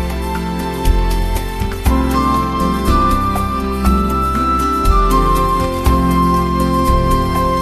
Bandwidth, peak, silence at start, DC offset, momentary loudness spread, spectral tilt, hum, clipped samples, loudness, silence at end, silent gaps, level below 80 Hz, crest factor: 14.5 kHz; 0 dBFS; 0 s; under 0.1%; 7 LU; -6.5 dB/octave; none; under 0.1%; -15 LUFS; 0 s; none; -18 dBFS; 14 dB